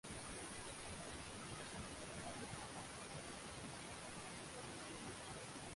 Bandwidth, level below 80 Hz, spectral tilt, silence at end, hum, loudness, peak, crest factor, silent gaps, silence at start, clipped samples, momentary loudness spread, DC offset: 11.5 kHz; -66 dBFS; -3 dB/octave; 0 s; none; -50 LUFS; -36 dBFS; 14 dB; none; 0.05 s; under 0.1%; 1 LU; under 0.1%